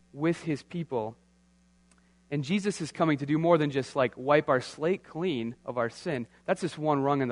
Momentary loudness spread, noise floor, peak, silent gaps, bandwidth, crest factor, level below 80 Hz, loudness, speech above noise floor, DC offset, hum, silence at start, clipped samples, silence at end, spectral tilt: 10 LU; -64 dBFS; -8 dBFS; none; 10.5 kHz; 22 dB; -68 dBFS; -29 LUFS; 35 dB; under 0.1%; none; 0.15 s; under 0.1%; 0 s; -6.5 dB/octave